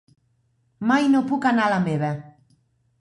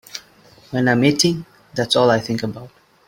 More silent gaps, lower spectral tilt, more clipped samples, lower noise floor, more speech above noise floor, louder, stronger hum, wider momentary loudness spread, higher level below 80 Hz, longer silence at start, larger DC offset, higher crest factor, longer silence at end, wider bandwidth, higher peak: neither; first, -6.5 dB/octave vs -4.5 dB/octave; neither; first, -66 dBFS vs -49 dBFS; first, 46 dB vs 32 dB; second, -21 LUFS vs -18 LUFS; neither; second, 10 LU vs 18 LU; second, -64 dBFS vs -56 dBFS; first, 0.8 s vs 0.15 s; neither; about the same, 16 dB vs 18 dB; first, 0.7 s vs 0.4 s; second, 11 kHz vs 17 kHz; second, -8 dBFS vs -2 dBFS